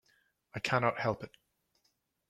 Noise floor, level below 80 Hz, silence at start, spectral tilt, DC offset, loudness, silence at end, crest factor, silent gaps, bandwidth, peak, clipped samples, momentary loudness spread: -78 dBFS; -68 dBFS; 0.55 s; -5.5 dB/octave; under 0.1%; -33 LUFS; 1 s; 24 dB; none; 15 kHz; -14 dBFS; under 0.1%; 17 LU